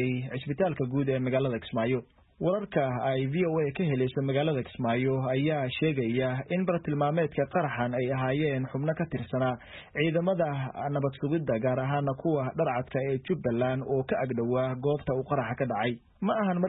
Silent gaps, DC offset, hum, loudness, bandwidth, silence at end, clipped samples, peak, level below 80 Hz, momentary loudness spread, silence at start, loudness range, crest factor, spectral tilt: none; under 0.1%; none; -29 LUFS; 4.1 kHz; 0 s; under 0.1%; -12 dBFS; -60 dBFS; 3 LU; 0 s; 1 LU; 16 dB; -11.5 dB/octave